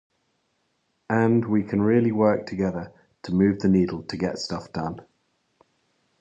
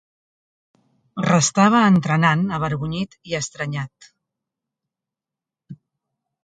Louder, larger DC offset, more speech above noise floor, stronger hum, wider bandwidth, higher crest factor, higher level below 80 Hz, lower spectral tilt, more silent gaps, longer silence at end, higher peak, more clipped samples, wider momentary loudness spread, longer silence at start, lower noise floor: second, -23 LUFS vs -19 LUFS; neither; second, 49 dB vs 69 dB; neither; about the same, 8.4 kHz vs 9.2 kHz; about the same, 18 dB vs 22 dB; about the same, -52 dBFS vs -56 dBFS; first, -7.5 dB/octave vs -5 dB/octave; neither; first, 1.2 s vs 0.7 s; second, -6 dBFS vs -2 dBFS; neither; about the same, 13 LU vs 13 LU; about the same, 1.1 s vs 1.15 s; second, -72 dBFS vs -88 dBFS